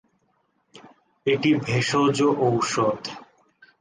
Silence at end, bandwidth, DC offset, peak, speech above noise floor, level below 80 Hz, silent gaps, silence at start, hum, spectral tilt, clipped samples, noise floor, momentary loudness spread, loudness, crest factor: 0.55 s; 10 kHz; under 0.1%; -10 dBFS; 47 dB; -62 dBFS; none; 0.75 s; none; -5 dB/octave; under 0.1%; -69 dBFS; 12 LU; -22 LUFS; 16 dB